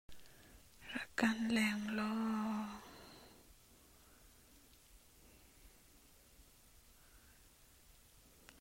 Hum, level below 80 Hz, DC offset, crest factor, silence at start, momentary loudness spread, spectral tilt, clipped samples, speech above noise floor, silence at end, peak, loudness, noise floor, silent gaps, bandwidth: none; -68 dBFS; under 0.1%; 24 dB; 0.1 s; 28 LU; -4.5 dB/octave; under 0.1%; 29 dB; 0.1 s; -20 dBFS; -39 LUFS; -65 dBFS; none; 16 kHz